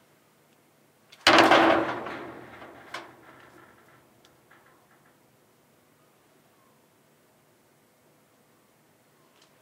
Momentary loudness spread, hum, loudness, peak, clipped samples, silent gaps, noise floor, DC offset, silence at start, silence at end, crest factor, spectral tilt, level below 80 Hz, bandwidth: 29 LU; none; -21 LUFS; 0 dBFS; under 0.1%; none; -63 dBFS; under 0.1%; 1.25 s; 6.6 s; 30 dB; -3 dB/octave; -68 dBFS; 16 kHz